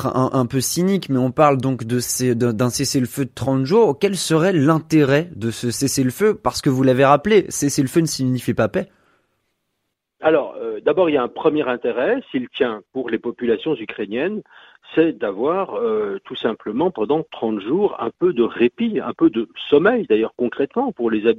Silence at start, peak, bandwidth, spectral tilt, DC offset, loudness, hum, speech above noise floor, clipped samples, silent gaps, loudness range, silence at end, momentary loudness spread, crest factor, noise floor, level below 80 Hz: 0 s; 0 dBFS; 15.5 kHz; -5.5 dB/octave; under 0.1%; -19 LUFS; none; 57 dB; under 0.1%; none; 5 LU; 0 s; 9 LU; 18 dB; -76 dBFS; -54 dBFS